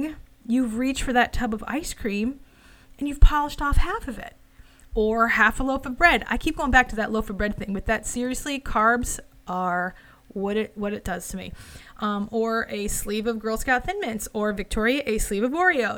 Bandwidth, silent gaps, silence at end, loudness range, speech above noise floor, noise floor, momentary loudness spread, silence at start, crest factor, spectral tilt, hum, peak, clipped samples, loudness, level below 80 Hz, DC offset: 17.5 kHz; none; 0 s; 6 LU; 27 dB; -51 dBFS; 13 LU; 0 s; 22 dB; -4.5 dB/octave; none; -2 dBFS; under 0.1%; -24 LUFS; -30 dBFS; under 0.1%